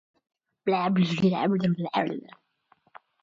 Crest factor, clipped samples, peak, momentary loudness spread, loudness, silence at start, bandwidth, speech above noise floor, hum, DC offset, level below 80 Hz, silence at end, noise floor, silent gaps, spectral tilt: 18 dB; under 0.1%; -10 dBFS; 9 LU; -26 LUFS; 0.65 s; 7.4 kHz; 41 dB; none; under 0.1%; -68 dBFS; 1.05 s; -66 dBFS; none; -7.5 dB/octave